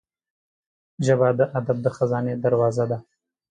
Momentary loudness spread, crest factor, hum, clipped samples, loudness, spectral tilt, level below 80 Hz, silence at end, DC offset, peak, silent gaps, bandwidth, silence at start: 7 LU; 16 dB; none; under 0.1%; -22 LUFS; -7.5 dB/octave; -62 dBFS; 0.5 s; under 0.1%; -6 dBFS; none; 9.4 kHz; 1 s